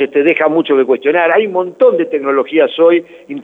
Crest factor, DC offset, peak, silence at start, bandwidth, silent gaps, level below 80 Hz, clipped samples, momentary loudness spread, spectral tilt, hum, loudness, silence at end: 12 dB; under 0.1%; 0 dBFS; 0 s; 3.9 kHz; none; -70 dBFS; under 0.1%; 5 LU; -7 dB/octave; none; -12 LUFS; 0 s